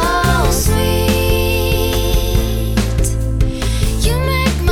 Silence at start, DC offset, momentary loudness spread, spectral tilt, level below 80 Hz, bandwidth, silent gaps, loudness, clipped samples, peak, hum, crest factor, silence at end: 0 s; under 0.1%; 4 LU; -5 dB/octave; -18 dBFS; 17 kHz; none; -16 LUFS; under 0.1%; -4 dBFS; none; 12 dB; 0 s